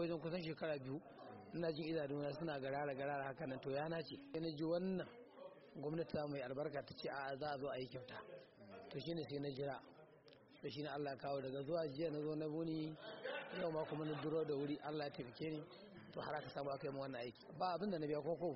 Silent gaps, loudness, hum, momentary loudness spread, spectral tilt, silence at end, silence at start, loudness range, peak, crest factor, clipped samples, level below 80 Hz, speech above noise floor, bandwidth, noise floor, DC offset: none; -46 LUFS; none; 12 LU; -5 dB/octave; 0 s; 0 s; 4 LU; -30 dBFS; 16 dB; under 0.1%; -76 dBFS; 21 dB; 5.8 kHz; -66 dBFS; under 0.1%